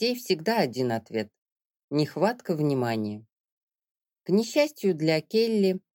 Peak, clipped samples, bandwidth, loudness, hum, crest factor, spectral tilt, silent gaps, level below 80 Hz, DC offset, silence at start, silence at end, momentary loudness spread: -10 dBFS; under 0.1%; 17.5 kHz; -26 LUFS; none; 18 dB; -6 dB/octave; 1.38-1.46 s, 1.52-1.56 s, 1.70-1.74 s, 1.84-1.88 s, 3.32-3.44 s, 3.52-3.67 s, 3.91-3.95 s; -76 dBFS; under 0.1%; 0 s; 0.15 s; 9 LU